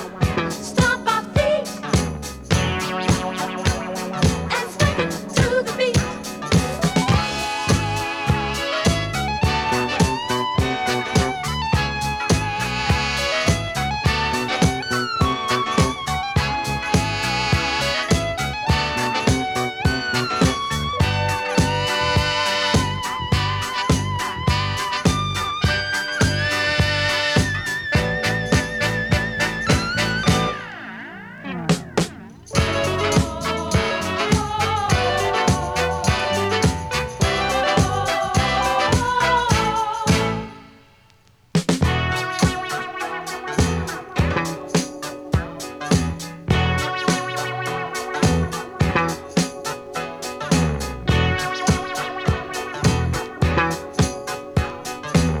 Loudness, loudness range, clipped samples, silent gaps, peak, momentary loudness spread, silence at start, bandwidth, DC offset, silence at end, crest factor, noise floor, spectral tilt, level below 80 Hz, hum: -21 LUFS; 3 LU; under 0.1%; none; -2 dBFS; 6 LU; 0 s; 18.5 kHz; under 0.1%; 0 s; 20 dB; -54 dBFS; -4.5 dB/octave; -34 dBFS; none